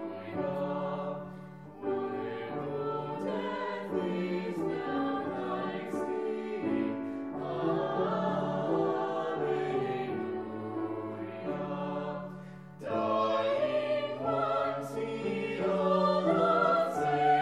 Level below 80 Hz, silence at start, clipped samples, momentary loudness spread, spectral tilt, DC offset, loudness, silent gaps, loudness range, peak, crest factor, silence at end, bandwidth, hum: -72 dBFS; 0 s; under 0.1%; 11 LU; -7 dB/octave; under 0.1%; -32 LUFS; none; 6 LU; -14 dBFS; 18 dB; 0 s; 13 kHz; none